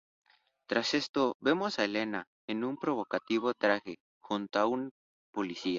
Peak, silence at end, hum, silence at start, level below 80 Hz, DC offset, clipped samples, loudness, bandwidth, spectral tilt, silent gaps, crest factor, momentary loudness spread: -12 dBFS; 0 s; none; 0.7 s; -74 dBFS; under 0.1%; under 0.1%; -32 LUFS; 7.6 kHz; -4.5 dB/octave; 1.09-1.14 s, 1.35-1.40 s, 2.27-2.48 s, 4.00-4.21 s, 4.91-5.33 s; 22 dB; 10 LU